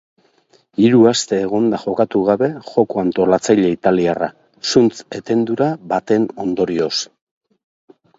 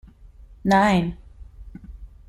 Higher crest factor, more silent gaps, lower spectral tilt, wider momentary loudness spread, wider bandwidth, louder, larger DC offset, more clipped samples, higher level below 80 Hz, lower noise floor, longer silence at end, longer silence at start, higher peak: about the same, 16 dB vs 18 dB; neither; about the same, -5.5 dB/octave vs -6.5 dB/octave; second, 9 LU vs 26 LU; second, 8 kHz vs 13.5 kHz; first, -17 LUFS vs -20 LUFS; neither; neither; second, -56 dBFS vs -42 dBFS; first, -56 dBFS vs -46 dBFS; first, 1.15 s vs 0.25 s; first, 0.8 s vs 0.65 s; first, 0 dBFS vs -6 dBFS